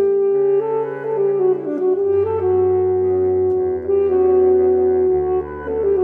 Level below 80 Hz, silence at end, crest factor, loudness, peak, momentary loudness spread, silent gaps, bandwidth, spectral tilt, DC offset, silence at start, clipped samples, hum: -46 dBFS; 0 s; 10 dB; -17 LUFS; -6 dBFS; 7 LU; none; 2.9 kHz; -11.5 dB/octave; under 0.1%; 0 s; under 0.1%; none